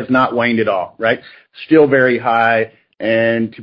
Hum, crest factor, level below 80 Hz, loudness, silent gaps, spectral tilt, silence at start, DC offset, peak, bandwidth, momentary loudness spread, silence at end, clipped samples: none; 14 dB; -58 dBFS; -14 LUFS; none; -8.5 dB/octave; 0 s; under 0.1%; 0 dBFS; 5.6 kHz; 10 LU; 0 s; under 0.1%